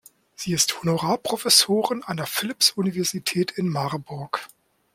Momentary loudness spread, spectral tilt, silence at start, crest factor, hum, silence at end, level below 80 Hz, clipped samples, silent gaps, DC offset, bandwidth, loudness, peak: 14 LU; -3 dB/octave; 0.4 s; 22 dB; none; 0.5 s; -64 dBFS; under 0.1%; none; under 0.1%; 16.5 kHz; -22 LUFS; -2 dBFS